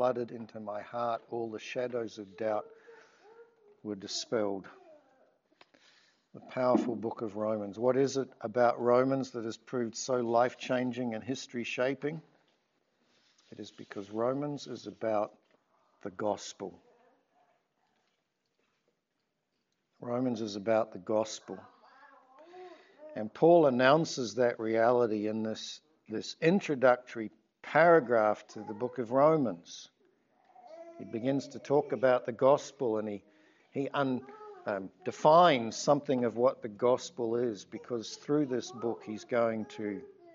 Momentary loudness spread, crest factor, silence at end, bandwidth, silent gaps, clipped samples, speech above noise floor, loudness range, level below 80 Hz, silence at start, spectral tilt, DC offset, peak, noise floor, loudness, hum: 18 LU; 22 dB; 0.25 s; 7.8 kHz; none; under 0.1%; 52 dB; 11 LU; -84 dBFS; 0 s; -4.5 dB/octave; under 0.1%; -10 dBFS; -82 dBFS; -31 LUFS; none